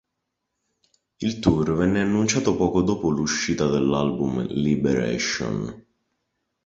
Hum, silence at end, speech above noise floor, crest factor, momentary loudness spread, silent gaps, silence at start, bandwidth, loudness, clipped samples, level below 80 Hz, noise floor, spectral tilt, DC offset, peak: none; 0.85 s; 58 dB; 20 dB; 6 LU; none; 1.2 s; 8 kHz; -23 LUFS; under 0.1%; -46 dBFS; -80 dBFS; -5 dB/octave; under 0.1%; -4 dBFS